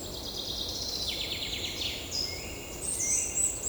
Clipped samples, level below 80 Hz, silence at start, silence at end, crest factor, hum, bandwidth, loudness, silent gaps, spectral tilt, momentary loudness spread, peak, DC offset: under 0.1%; -48 dBFS; 0 s; 0 s; 16 dB; none; over 20 kHz; -31 LUFS; none; -1 dB/octave; 9 LU; -16 dBFS; under 0.1%